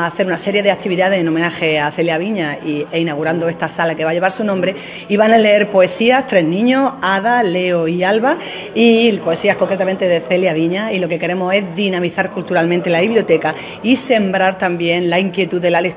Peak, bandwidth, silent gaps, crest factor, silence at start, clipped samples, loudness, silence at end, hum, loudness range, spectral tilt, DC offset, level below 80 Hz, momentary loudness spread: 0 dBFS; 4 kHz; none; 14 dB; 0 s; under 0.1%; -15 LUFS; 0 s; none; 3 LU; -9.5 dB/octave; under 0.1%; -56 dBFS; 7 LU